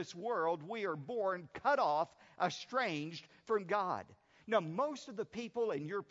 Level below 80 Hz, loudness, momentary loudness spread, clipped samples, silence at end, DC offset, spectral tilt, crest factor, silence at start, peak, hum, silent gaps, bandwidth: -80 dBFS; -37 LUFS; 9 LU; under 0.1%; 0.05 s; under 0.1%; -3.5 dB/octave; 20 dB; 0 s; -18 dBFS; none; none; 7.6 kHz